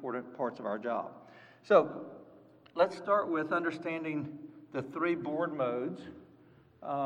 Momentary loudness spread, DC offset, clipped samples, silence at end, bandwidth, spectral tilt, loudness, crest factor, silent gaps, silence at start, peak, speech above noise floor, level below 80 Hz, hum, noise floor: 20 LU; under 0.1%; under 0.1%; 0 s; 9.8 kHz; -7 dB/octave; -33 LUFS; 24 dB; none; 0 s; -10 dBFS; 28 dB; -80 dBFS; none; -61 dBFS